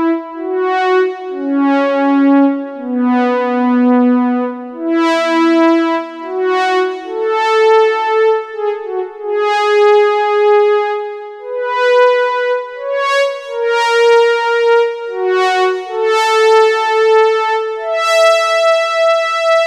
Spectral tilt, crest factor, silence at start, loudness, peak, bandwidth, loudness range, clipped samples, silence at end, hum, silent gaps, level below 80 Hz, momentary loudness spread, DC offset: -2.5 dB/octave; 12 dB; 0 s; -13 LUFS; -2 dBFS; 12.5 kHz; 2 LU; under 0.1%; 0 s; none; none; -72 dBFS; 10 LU; under 0.1%